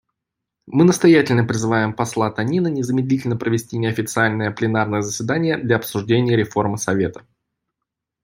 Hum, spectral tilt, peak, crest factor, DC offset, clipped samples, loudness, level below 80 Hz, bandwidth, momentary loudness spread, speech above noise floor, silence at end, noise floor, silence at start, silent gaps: none; -6 dB/octave; -2 dBFS; 18 dB; under 0.1%; under 0.1%; -19 LUFS; -56 dBFS; 16.5 kHz; 8 LU; 64 dB; 1.05 s; -82 dBFS; 0.65 s; none